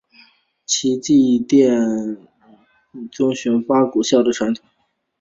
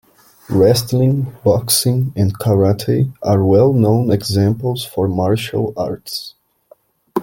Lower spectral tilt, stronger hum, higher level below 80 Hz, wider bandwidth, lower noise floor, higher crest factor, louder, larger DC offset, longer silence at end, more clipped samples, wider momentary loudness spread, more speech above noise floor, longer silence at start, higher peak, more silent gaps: second, -4.5 dB/octave vs -6 dB/octave; neither; second, -60 dBFS vs -48 dBFS; second, 7.8 kHz vs 17 kHz; about the same, -53 dBFS vs -51 dBFS; about the same, 16 dB vs 14 dB; about the same, -17 LUFS vs -16 LUFS; neither; first, 0.65 s vs 0 s; neither; first, 16 LU vs 10 LU; about the same, 36 dB vs 36 dB; first, 0.7 s vs 0.5 s; about the same, -2 dBFS vs -2 dBFS; neither